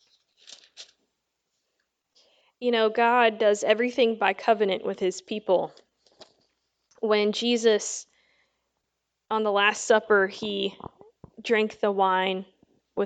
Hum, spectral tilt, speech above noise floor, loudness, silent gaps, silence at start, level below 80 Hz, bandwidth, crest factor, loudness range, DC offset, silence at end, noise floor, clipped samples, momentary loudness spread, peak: none; -3 dB/octave; 57 dB; -24 LUFS; none; 0.8 s; -72 dBFS; 9.2 kHz; 20 dB; 4 LU; under 0.1%; 0 s; -81 dBFS; under 0.1%; 12 LU; -6 dBFS